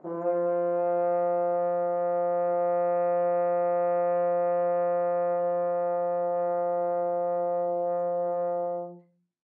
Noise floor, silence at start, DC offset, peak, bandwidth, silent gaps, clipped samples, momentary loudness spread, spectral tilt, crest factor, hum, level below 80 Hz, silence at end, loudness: -54 dBFS; 0.05 s; under 0.1%; -18 dBFS; 2.8 kHz; none; under 0.1%; 3 LU; -11.5 dB/octave; 10 dB; none; under -90 dBFS; 0.6 s; -27 LUFS